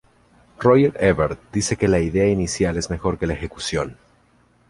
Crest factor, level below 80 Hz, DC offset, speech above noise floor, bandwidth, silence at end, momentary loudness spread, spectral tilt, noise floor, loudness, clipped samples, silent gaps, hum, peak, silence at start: 18 dB; -38 dBFS; under 0.1%; 38 dB; 11.5 kHz; 0.75 s; 10 LU; -5.5 dB/octave; -58 dBFS; -20 LUFS; under 0.1%; none; none; -2 dBFS; 0.6 s